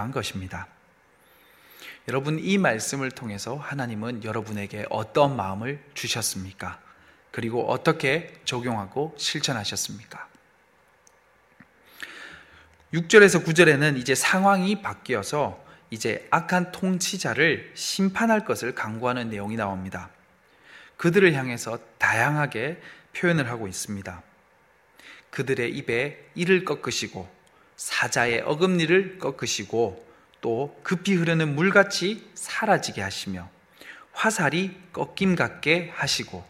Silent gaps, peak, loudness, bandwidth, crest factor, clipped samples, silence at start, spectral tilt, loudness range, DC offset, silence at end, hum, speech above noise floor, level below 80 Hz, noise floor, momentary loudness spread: none; -2 dBFS; -24 LUFS; 16 kHz; 24 dB; under 0.1%; 0 s; -4.5 dB/octave; 8 LU; under 0.1%; 0.05 s; none; 36 dB; -62 dBFS; -60 dBFS; 17 LU